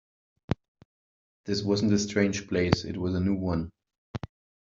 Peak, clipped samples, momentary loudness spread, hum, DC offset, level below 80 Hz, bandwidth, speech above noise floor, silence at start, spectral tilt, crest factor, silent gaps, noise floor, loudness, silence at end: -2 dBFS; under 0.1%; 16 LU; none; under 0.1%; -54 dBFS; 7.8 kHz; over 63 dB; 0.5 s; -5.5 dB/octave; 28 dB; 0.68-0.75 s, 0.85-1.44 s, 3.98-4.14 s; under -90 dBFS; -28 LUFS; 0.45 s